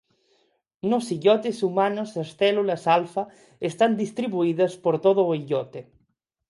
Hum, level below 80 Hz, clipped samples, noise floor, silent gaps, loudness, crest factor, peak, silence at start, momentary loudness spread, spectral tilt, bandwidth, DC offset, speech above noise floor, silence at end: none; -72 dBFS; under 0.1%; -72 dBFS; none; -24 LUFS; 18 dB; -6 dBFS; 0.85 s; 11 LU; -6 dB/octave; 11.5 kHz; under 0.1%; 49 dB; 0.7 s